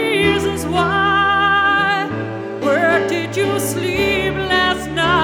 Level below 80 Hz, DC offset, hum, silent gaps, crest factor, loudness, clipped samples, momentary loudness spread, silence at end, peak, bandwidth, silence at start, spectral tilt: -40 dBFS; under 0.1%; none; none; 14 dB; -16 LUFS; under 0.1%; 6 LU; 0 s; -2 dBFS; 20 kHz; 0 s; -4.5 dB/octave